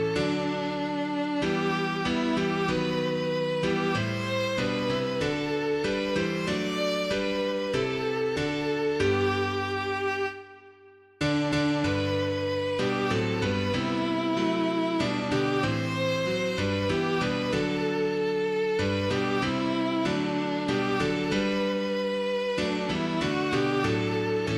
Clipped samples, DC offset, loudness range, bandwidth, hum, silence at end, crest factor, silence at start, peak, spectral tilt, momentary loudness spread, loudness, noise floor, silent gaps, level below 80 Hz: under 0.1%; under 0.1%; 1 LU; 14.5 kHz; none; 0 s; 14 dB; 0 s; -14 dBFS; -5.5 dB/octave; 2 LU; -27 LUFS; -54 dBFS; none; -52 dBFS